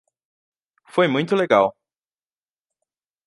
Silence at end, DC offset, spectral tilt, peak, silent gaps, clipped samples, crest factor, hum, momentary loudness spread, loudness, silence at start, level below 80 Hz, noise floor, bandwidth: 1.55 s; under 0.1%; -6.5 dB/octave; -2 dBFS; none; under 0.1%; 22 dB; none; 6 LU; -20 LUFS; 0.95 s; -68 dBFS; under -90 dBFS; 11.5 kHz